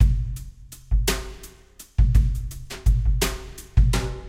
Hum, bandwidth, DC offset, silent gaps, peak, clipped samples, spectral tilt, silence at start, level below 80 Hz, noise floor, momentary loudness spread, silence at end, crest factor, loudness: none; 16 kHz; under 0.1%; none; -4 dBFS; under 0.1%; -5 dB/octave; 0 s; -22 dBFS; -48 dBFS; 19 LU; 0 s; 18 dB; -24 LUFS